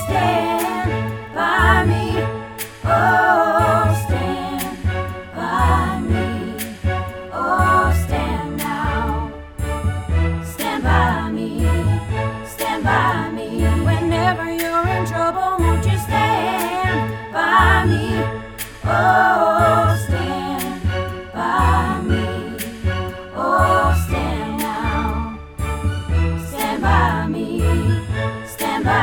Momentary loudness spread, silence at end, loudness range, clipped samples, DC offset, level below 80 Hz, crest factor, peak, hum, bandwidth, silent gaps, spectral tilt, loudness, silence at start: 11 LU; 0 s; 4 LU; under 0.1%; under 0.1%; -28 dBFS; 18 dB; 0 dBFS; none; over 20 kHz; none; -6 dB/octave; -19 LUFS; 0 s